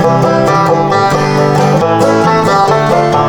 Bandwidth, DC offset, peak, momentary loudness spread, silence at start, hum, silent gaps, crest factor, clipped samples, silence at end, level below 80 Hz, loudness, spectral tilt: 19 kHz; under 0.1%; 0 dBFS; 1 LU; 0 s; none; none; 8 dB; under 0.1%; 0 s; -42 dBFS; -9 LUFS; -6 dB/octave